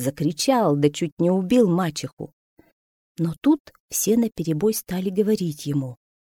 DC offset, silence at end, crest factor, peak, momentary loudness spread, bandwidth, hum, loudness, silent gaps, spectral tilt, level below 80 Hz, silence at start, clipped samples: under 0.1%; 0.45 s; 16 dB; -6 dBFS; 9 LU; 18.5 kHz; none; -22 LUFS; 1.12-1.17 s, 2.13-2.17 s, 2.33-2.57 s, 2.72-3.15 s, 3.60-3.65 s, 3.80-3.88 s; -5.5 dB/octave; -58 dBFS; 0 s; under 0.1%